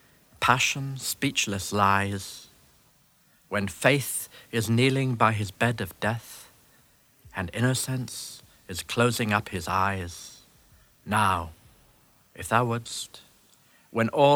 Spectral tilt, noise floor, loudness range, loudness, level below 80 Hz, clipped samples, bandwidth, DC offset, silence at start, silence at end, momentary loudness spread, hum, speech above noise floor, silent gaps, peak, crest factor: -4.5 dB/octave; -62 dBFS; 4 LU; -26 LUFS; -58 dBFS; under 0.1%; over 20 kHz; under 0.1%; 0.4 s; 0 s; 17 LU; none; 36 dB; none; -4 dBFS; 24 dB